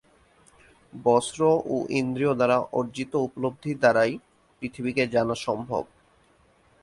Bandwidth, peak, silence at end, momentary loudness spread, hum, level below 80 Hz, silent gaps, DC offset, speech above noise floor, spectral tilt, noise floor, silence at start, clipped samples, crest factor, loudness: 11.5 kHz; -8 dBFS; 1 s; 10 LU; none; -62 dBFS; none; under 0.1%; 37 dB; -5.5 dB/octave; -61 dBFS; 0.95 s; under 0.1%; 20 dB; -25 LUFS